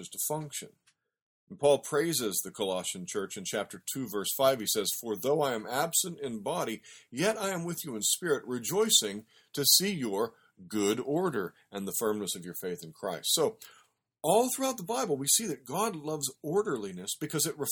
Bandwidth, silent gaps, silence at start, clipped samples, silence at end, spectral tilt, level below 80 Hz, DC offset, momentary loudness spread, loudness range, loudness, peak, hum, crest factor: 19 kHz; 1.22-1.47 s; 0 s; under 0.1%; 0 s; -2.5 dB/octave; -74 dBFS; under 0.1%; 11 LU; 4 LU; -30 LUFS; -8 dBFS; none; 24 dB